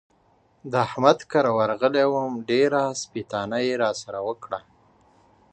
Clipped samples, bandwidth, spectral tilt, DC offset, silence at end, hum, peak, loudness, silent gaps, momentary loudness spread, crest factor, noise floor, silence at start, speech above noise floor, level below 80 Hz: under 0.1%; 9 kHz; -5 dB/octave; under 0.1%; 0.95 s; none; -2 dBFS; -23 LUFS; none; 11 LU; 22 dB; -62 dBFS; 0.65 s; 39 dB; -66 dBFS